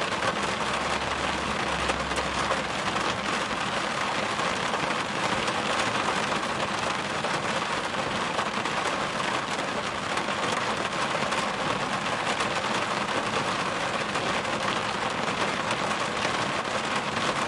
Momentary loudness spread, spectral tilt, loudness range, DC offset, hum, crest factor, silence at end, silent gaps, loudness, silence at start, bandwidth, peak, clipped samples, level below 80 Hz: 2 LU; -3 dB/octave; 1 LU; under 0.1%; none; 18 dB; 0 s; none; -27 LUFS; 0 s; 11.5 kHz; -10 dBFS; under 0.1%; -52 dBFS